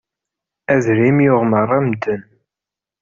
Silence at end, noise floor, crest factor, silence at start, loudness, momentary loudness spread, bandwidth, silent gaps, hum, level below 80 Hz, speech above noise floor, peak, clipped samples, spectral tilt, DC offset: 0.8 s; -87 dBFS; 14 dB; 0.7 s; -15 LUFS; 11 LU; 7.4 kHz; none; none; -54 dBFS; 72 dB; -2 dBFS; under 0.1%; -8 dB/octave; under 0.1%